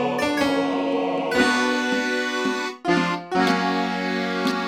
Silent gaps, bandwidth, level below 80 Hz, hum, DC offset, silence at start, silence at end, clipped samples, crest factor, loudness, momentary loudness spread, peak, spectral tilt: none; 16 kHz; -58 dBFS; none; under 0.1%; 0 s; 0 s; under 0.1%; 16 dB; -22 LUFS; 5 LU; -6 dBFS; -4.5 dB/octave